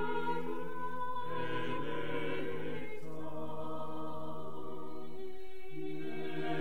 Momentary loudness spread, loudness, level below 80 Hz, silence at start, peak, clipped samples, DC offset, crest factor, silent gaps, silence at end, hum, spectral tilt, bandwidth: 9 LU; -41 LUFS; -66 dBFS; 0 s; -22 dBFS; under 0.1%; 2%; 16 dB; none; 0 s; none; -7 dB/octave; 16 kHz